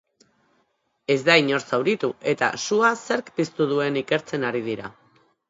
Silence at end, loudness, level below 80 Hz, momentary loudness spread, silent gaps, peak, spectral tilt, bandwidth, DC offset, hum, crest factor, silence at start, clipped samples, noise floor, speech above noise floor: 0.6 s; -22 LUFS; -70 dBFS; 11 LU; none; 0 dBFS; -4.5 dB/octave; 8 kHz; under 0.1%; none; 24 dB; 1.1 s; under 0.1%; -70 dBFS; 47 dB